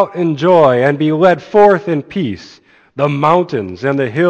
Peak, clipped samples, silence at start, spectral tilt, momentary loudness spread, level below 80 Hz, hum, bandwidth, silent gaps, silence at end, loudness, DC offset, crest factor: 0 dBFS; under 0.1%; 0 s; -8 dB/octave; 11 LU; -54 dBFS; none; 8.4 kHz; none; 0 s; -13 LUFS; under 0.1%; 12 dB